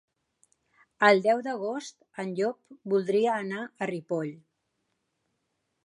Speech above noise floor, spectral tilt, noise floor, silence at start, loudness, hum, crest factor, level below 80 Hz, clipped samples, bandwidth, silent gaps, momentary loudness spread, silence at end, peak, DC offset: 51 dB; -5.5 dB/octave; -79 dBFS; 1 s; -28 LUFS; none; 24 dB; -84 dBFS; under 0.1%; 11 kHz; none; 16 LU; 1.5 s; -6 dBFS; under 0.1%